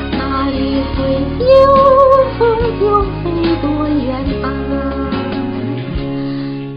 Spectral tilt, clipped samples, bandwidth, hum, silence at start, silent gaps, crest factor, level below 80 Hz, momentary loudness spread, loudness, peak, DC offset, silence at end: -9 dB/octave; under 0.1%; 5.2 kHz; none; 0 s; none; 14 dB; -26 dBFS; 12 LU; -14 LUFS; 0 dBFS; under 0.1%; 0 s